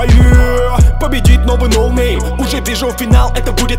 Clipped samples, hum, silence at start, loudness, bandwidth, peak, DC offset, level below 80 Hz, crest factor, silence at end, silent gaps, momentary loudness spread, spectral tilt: 0.8%; none; 0 s; -12 LUFS; 16 kHz; 0 dBFS; under 0.1%; -12 dBFS; 10 dB; 0 s; none; 7 LU; -5.5 dB/octave